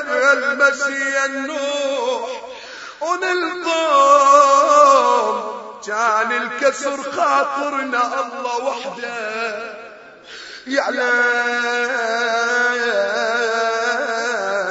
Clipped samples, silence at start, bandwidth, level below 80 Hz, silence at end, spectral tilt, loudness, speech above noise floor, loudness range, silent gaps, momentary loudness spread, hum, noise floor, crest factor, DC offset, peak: under 0.1%; 0 s; 8 kHz; -66 dBFS; 0 s; -1 dB/octave; -17 LUFS; 21 dB; 7 LU; none; 16 LU; none; -39 dBFS; 18 dB; under 0.1%; 0 dBFS